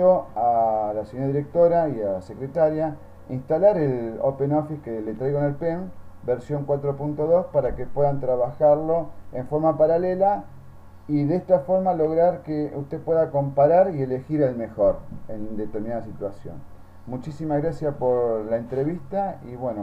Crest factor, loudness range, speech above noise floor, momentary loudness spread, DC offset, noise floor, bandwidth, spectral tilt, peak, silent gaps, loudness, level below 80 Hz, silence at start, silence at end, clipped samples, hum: 18 dB; 6 LU; 19 dB; 13 LU; under 0.1%; -42 dBFS; 7.8 kHz; -10.5 dB/octave; -6 dBFS; none; -23 LUFS; -48 dBFS; 0 s; 0 s; under 0.1%; none